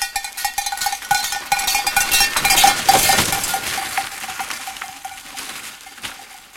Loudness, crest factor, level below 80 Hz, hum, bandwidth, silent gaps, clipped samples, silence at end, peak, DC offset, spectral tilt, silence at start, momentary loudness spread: -17 LUFS; 20 dB; -44 dBFS; none; 17 kHz; none; under 0.1%; 0 s; 0 dBFS; under 0.1%; 0 dB/octave; 0 s; 19 LU